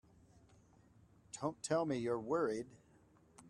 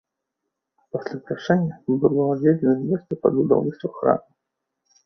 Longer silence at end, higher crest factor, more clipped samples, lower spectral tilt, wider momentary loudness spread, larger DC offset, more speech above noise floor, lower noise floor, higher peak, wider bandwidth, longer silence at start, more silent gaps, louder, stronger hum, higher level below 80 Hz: second, 0 s vs 0.85 s; about the same, 20 dB vs 20 dB; neither; second, -5.5 dB/octave vs -9.5 dB/octave; about the same, 12 LU vs 11 LU; neither; second, 30 dB vs 60 dB; second, -68 dBFS vs -81 dBFS; second, -22 dBFS vs -2 dBFS; first, 12 kHz vs 6.2 kHz; first, 1.35 s vs 0.95 s; neither; second, -39 LUFS vs -22 LUFS; neither; second, -74 dBFS vs -62 dBFS